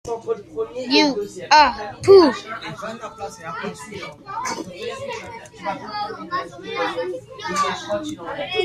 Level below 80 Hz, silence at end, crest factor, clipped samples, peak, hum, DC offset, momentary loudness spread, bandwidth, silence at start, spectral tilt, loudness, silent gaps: -54 dBFS; 0 s; 20 dB; under 0.1%; -2 dBFS; none; under 0.1%; 18 LU; 12 kHz; 0.05 s; -4 dB/octave; -21 LUFS; none